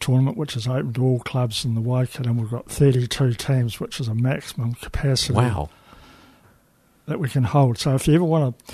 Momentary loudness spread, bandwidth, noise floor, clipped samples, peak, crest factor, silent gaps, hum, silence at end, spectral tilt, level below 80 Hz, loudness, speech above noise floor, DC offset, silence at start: 9 LU; 13.5 kHz; -59 dBFS; under 0.1%; -2 dBFS; 18 dB; none; none; 0 s; -6 dB/octave; -42 dBFS; -22 LUFS; 38 dB; under 0.1%; 0 s